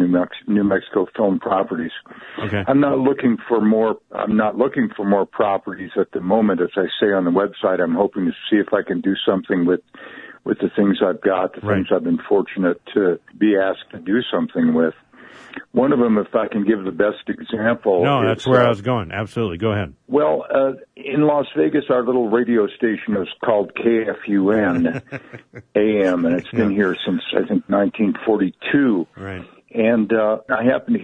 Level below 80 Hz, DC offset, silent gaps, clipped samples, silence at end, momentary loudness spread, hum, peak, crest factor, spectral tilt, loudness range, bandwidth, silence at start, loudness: -56 dBFS; under 0.1%; none; under 0.1%; 0 s; 7 LU; none; -2 dBFS; 16 dB; -8 dB/octave; 2 LU; 7.6 kHz; 0 s; -19 LUFS